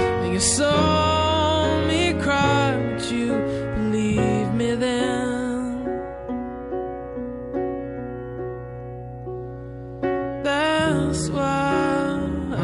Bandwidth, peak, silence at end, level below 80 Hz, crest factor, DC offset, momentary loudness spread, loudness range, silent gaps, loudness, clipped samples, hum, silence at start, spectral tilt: 11.5 kHz; -8 dBFS; 0 s; -40 dBFS; 16 dB; under 0.1%; 14 LU; 11 LU; none; -23 LUFS; under 0.1%; none; 0 s; -4.5 dB/octave